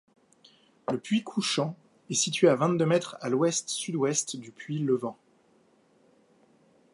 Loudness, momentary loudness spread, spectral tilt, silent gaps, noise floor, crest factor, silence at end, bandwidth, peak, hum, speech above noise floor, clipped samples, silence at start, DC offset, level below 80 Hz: -28 LUFS; 14 LU; -4 dB/octave; none; -64 dBFS; 22 dB; 1.8 s; 11.5 kHz; -8 dBFS; none; 37 dB; under 0.1%; 0.9 s; under 0.1%; -76 dBFS